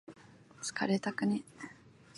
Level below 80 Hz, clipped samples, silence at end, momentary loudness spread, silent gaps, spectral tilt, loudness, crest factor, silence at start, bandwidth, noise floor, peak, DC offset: -76 dBFS; under 0.1%; 0.3 s; 17 LU; none; -5 dB/octave; -35 LUFS; 18 dB; 0.1 s; 11.5 kHz; -57 dBFS; -18 dBFS; under 0.1%